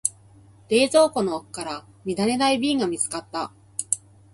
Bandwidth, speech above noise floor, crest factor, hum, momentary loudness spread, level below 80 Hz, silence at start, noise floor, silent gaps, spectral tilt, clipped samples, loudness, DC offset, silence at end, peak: 12 kHz; 29 dB; 24 dB; none; 13 LU; -62 dBFS; 0.05 s; -51 dBFS; none; -3 dB/octave; under 0.1%; -24 LUFS; under 0.1%; 0.35 s; -2 dBFS